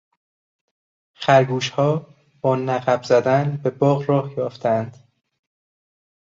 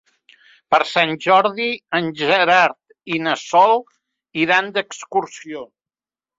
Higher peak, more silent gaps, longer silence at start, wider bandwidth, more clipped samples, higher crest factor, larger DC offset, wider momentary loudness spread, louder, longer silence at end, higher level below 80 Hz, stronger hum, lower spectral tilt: about the same, -2 dBFS vs 0 dBFS; neither; first, 1.2 s vs 0.7 s; about the same, 7.6 kHz vs 7.8 kHz; neither; about the same, 20 dB vs 18 dB; neither; second, 9 LU vs 16 LU; second, -20 LUFS vs -17 LUFS; first, 1.4 s vs 0.75 s; about the same, -62 dBFS vs -66 dBFS; neither; first, -6.5 dB/octave vs -4 dB/octave